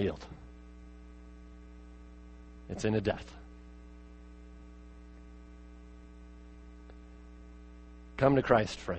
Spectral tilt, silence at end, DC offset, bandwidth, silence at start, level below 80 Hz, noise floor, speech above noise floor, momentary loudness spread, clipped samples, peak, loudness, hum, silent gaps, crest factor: -6.5 dB/octave; 0 s; under 0.1%; 8.4 kHz; 0 s; -52 dBFS; -51 dBFS; 21 dB; 25 LU; under 0.1%; -10 dBFS; -30 LUFS; none; none; 28 dB